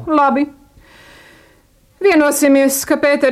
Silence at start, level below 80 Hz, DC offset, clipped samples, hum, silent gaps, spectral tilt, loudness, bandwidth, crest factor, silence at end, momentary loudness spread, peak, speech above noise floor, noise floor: 0 s; -52 dBFS; under 0.1%; under 0.1%; none; none; -3 dB/octave; -14 LUFS; 16 kHz; 14 dB; 0 s; 6 LU; -2 dBFS; 39 dB; -52 dBFS